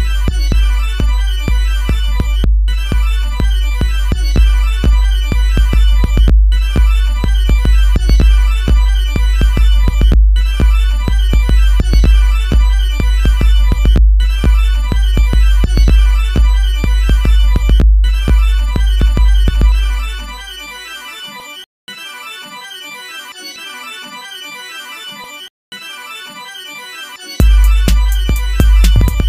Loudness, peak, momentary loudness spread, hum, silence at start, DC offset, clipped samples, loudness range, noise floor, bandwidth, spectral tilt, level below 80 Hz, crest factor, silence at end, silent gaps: -13 LUFS; 0 dBFS; 15 LU; none; 0 s; under 0.1%; under 0.1%; 14 LU; -29 dBFS; 14 kHz; -5.5 dB/octave; -10 dBFS; 10 dB; 0 s; 21.66-21.87 s, 25.50-25.72 s